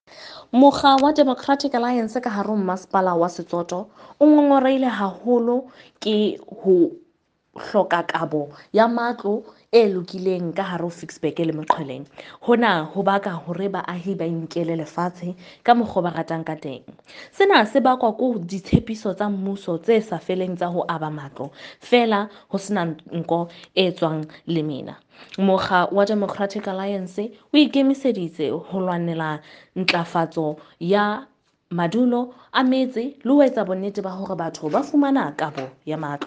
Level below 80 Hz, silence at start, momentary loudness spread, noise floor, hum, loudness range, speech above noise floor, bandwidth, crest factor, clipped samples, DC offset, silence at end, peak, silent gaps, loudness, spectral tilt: -56 dBFS; 0.15 s; 13 LU; -65 dBFS; none; 4 LU; 44 dB; 9.2 kHz; 22 dB; under 0.1%; under 0.1%; 0 s; 0 dBFS; none; -21 LUFS; -6.5 dB/octave